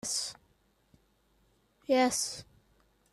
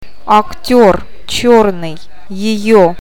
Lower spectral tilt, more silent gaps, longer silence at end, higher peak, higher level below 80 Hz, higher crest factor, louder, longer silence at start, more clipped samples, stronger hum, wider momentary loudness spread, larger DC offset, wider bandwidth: second, -1.5 dB/octave vs -5 dB/octave; neither; first, 0.7 s vs 0.05 s; second, -16 dBFS vs 0 dBFS; second, -70 dBFS vs -36 dBFS; first, 18 dB vs 12 dB; second, -30 LUFS vs -11 LUFS; second, 0.05 s vs 0.25 s; second, under 0.1% vs 0.8%; neither; first, 18 LU vs 13 LU; second, under 0.1% vs 9%; second, 14 kHz vs 18 kHz